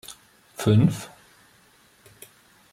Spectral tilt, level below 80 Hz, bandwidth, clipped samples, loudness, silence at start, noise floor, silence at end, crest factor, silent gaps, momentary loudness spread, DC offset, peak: -7 dB/octave; -56 dBFS; 15.5 kHz; under 0.1%; -22 LUFS; 0.1 s; -58 dBFS; 1.65 s; 18 dB; none; 24 LU; under 0.1%; -8 dBFS